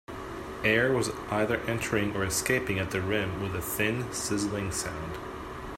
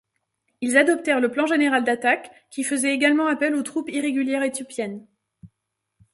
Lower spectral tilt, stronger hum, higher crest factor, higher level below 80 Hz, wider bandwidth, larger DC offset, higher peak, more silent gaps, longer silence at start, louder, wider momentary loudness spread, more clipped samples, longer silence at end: about the same, -4 dB/octave vs -3 dB/octave; neither; about the same, 18 dB vs 20 dB; first, -50 dBFS vs -70 dBFS; first, 16 kHz vs 11.5 kHz; neither; second, -12 dBFS vs -4 dBFS; neither; second, 0.1 s vs 0.6 s; second, -29 LUFS vs -22 LUFS; about the same, 13 LU vs 12 LU; neither; second, 0 s vs 0.65 s